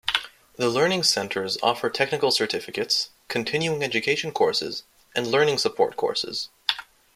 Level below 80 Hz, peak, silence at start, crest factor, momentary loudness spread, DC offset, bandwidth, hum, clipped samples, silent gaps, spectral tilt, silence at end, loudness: -64 dBFS; -2 dBFS; 0.05 s; 22 dB; 8 LU; under 0.1%; 16 kHz; none; under 0.1%; none; -3 dB/octave; 0.3 s; -24 LUFS